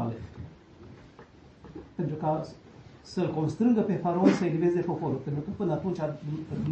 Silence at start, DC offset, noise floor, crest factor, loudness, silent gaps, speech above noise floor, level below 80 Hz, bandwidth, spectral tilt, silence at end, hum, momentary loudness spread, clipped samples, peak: 0 s; under 0.1%; -52 dBFS; 22 dB; -29 LUFS; none; 25 dB; -58 dBFS; 8.6 kHz; -8.5 dB/octave; 0 s; none; 23 LU; under 0.1%; -8 dBFS